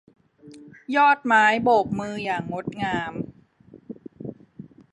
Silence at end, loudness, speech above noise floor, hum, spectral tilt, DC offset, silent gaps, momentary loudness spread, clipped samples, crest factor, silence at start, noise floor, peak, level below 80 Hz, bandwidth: 0.3 s; -22 LUFS; 30 dB; none; -5.5 dB/octave; under 0.1%; none; 23 LU; under 0.1%; 20 dB; 0.45 s; -51 dBFS; -6 dBFS; -60 dBFS; 10.5 kHz